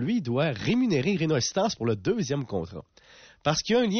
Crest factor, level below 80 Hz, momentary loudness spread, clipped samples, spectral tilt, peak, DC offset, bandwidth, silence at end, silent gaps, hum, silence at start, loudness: 14 dB; -56 dBFS; 9 LU; under 0.1%; -5 dB/octave; -14 dBFS; under 0.1%; 6.6 kHz; 0 s; none; none; 0 s; -26 LUFS